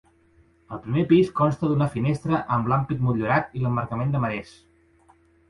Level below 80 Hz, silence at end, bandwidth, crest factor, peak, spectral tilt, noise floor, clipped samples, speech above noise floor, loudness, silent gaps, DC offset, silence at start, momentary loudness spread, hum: -52 dBFS; 1.05 s; 11 kHz; 18 dB; -6 dBFS; -8.5 dB/octave; -59 dBFS; under 0.1%; 36 dB; -23 LUFS; none; under 0.1%; 0.7 s; 8 LU; none